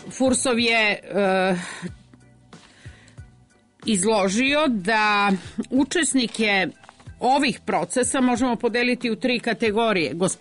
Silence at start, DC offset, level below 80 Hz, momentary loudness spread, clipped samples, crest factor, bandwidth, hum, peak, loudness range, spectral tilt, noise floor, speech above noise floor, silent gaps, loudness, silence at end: 0 s; under 0.1%; -54 dBFS; 6 LU; under 0.1%; 12 dB; 11 kHz; none; -10 dBFS; 5 LU; -3.5 dB/octave; -56 dBFS; 34 dB; none; -21 LUFS; 0.05 s